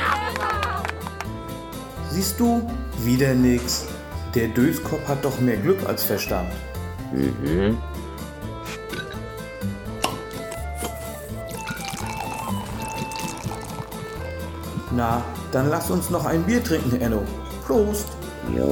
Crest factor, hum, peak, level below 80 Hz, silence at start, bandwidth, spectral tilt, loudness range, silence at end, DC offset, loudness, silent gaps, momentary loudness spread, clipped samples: 18 dB; none; -6 dBFS; -38 dBFS; 0 s; 18 kHz; -5.5 dB/octave; 8 LU; 0 s; under 0.1%; -25 LUFS; none; 12 LU; under 0.1%